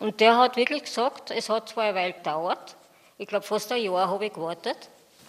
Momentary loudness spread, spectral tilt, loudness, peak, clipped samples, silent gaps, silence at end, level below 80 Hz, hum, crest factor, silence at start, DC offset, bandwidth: 12 LU; -3.5 dB/octave; -26 LUFS; -4 dBFS; under 0.1%; none; 0.45 s; -82 dBFS; none; 22 dB; 0 s; under 0.1%; 15.5 kHz